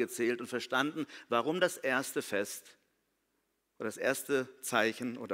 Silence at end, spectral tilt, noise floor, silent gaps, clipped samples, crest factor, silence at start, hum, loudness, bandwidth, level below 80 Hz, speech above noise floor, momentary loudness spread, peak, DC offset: 0 s; -3.5 dB/octave; -80 dBFS; none; under 0.1%; 22 dB; 0 s; none; -34 LUFS; 16 kHz; -80 dBFS; 46 dB; 10 LU; -12 dBFS; under 0.1%